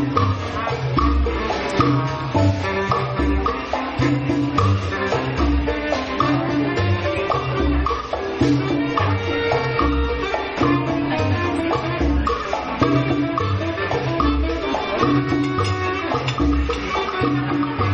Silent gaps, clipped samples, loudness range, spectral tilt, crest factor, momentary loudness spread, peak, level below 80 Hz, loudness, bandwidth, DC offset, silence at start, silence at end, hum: none; under 0.1%; 1 LU; -7 dB/octave; 12 dB; 4 LU; -6 dBFS; -30 dBFS; -21 LUFS; 8.8 kHz; under 0.1%; 0 s; 0 s; none